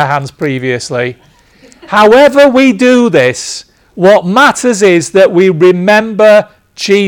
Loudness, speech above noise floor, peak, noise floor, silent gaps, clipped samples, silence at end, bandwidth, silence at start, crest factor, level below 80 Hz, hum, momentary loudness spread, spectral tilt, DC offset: -7 LUFS; 34 dB; 0 dBFS; -42 dBFS; none; 2%; 0 s; 18 kHz; 0 s; 8 dB; -48 dBFS; none; 11 LU; -5 dB/octave; under 0.1%